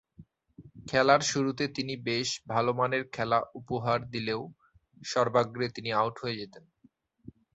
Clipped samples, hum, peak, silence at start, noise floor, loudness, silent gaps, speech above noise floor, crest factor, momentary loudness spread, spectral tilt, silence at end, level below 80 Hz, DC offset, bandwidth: under 0.1%; none; -8 dBFS; 0.2 s; -66 dBFS; -29 LUFS; none; 36 dB; 24 dB; 12 LU; -4 dB/octave; 0.25 s; -64 dBFS; under 0.1%; 8.2 kHz